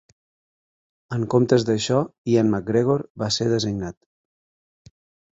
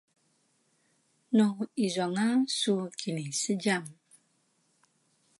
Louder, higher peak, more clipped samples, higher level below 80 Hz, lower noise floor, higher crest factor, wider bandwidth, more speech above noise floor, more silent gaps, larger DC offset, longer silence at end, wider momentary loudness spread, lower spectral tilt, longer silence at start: first, -22 LUFS vs -29 LUFS; first, -4 dBFS vs -12 dBFS; neither; first, -54 dBFS vs -82 dBFS; first, under -90 dBFS vs -72 dBFS; about the same, 20 dB vs 18 dB; second, 8 kHz vs 11.5 kHz; first, over 69 dB vs 43 dB; first, 2.18-2.24 s, 3.10-3.15 s vs none; neither; about the same, 1.4 s vs 1.5 s; first, 10 LU vs 7 LU; first, -6 dB/octave vs -4 dB/octave; second, 1.1 s vs 1.3 s